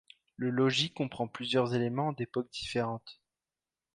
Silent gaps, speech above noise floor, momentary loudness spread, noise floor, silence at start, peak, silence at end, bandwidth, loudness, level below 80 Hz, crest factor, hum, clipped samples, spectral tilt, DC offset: none; over 58 dB; 9 LU; under -90 dBFS; 0.4 s; -16 dBFS; 0.8 s; 11 kHz; -32 LUFS; -66 dBFS; 18 dB; none; under 0.1%; -5.5 dB/octave; under 0.1%